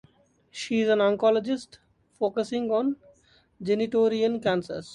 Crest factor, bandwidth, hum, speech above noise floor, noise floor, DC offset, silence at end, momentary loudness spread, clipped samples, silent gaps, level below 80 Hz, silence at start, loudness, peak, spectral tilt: 16 dB; 11 kHz; none; 36 dB; -61 dBFS; under 0.1%; 0 s; 12 LU; under 0.1%; none; -66 dBFS; 0.55 s; -25 LUFS; -10 dBFS; -5.5 dB/octave